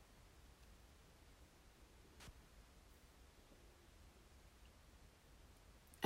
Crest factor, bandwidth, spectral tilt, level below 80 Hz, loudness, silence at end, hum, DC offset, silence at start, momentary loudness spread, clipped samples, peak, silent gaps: 32 dB; 16 kHz; -3.5 dB/octave; -68 dBFS; -66 LUFS; 0 s; none; under 0.1%; 0 s; 5 LU; under 0.1%; -24 dBFS; none